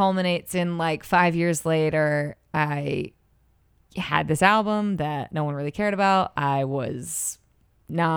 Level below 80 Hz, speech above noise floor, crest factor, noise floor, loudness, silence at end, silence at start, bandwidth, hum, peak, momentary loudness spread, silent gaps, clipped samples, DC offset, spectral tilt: -56 dBFS; 39 dB; 20 dB; -62 dBFS; -24 LUFS; 0 s; 0 s; 20 kHz; none; -4 dBFS; 9 LU; none; under 0.1%; under 0.1%; -5 dB/octave